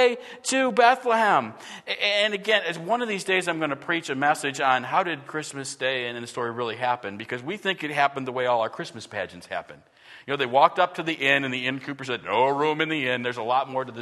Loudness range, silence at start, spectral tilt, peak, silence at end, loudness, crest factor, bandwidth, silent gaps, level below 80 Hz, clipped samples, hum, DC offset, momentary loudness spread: 5 LU; 0 s; -3.5 dB/octave; -2 dBFS; 0 s; -24 LUFS; 22 dB; 12.5 kHz; none; -74 dBFS; under 0.1%; none; under 0.1%; 12 LU